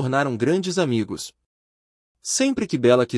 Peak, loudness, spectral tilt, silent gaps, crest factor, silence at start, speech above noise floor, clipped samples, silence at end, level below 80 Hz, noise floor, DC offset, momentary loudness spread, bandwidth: -4 dBFS; -22 LUFS; -4.5 dB/octave; 1.46-2.15 s; 18 dB; 0 s; over 69 dB; under 0.1%; 0 s; -62 dBFS; under -90 dBFS; under 0.1%; 14 LU; 12 kHz